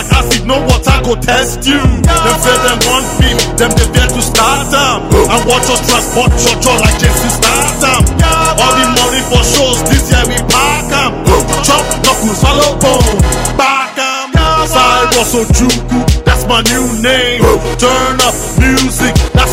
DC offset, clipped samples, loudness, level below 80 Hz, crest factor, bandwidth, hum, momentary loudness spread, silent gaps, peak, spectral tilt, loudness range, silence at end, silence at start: under 0.1%; 0.2%; -9 LUFS; -16 dBFS; 10 dB; 16.5 kHz; none; 3 LU; none; 0 dBFS; -3.5 dB/octave; 1 LU; 0 s; 0 s